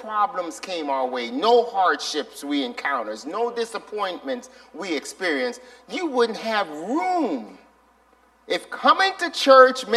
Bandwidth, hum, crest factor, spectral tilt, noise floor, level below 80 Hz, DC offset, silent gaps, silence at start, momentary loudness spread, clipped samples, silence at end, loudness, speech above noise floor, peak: 13 kHz; none; 22 dB; -2.5 dB/octave; -58 dBFS; -70 dBFS; under 0.1%; none; 0 s; 13 LU; under 0.1%; 0 s; -22 LUFS; 36 dB; 0 dBFS